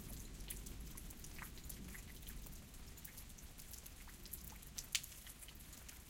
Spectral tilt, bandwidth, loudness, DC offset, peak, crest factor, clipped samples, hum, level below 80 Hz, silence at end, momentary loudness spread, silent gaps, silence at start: -2 dB/octave; 17 kHz; -51 LUFS; under 0.1%; -16 dBFS; 36 dB; under 0.1%; none; -56 dBFS; 0 s; 13 LU; none; 0 s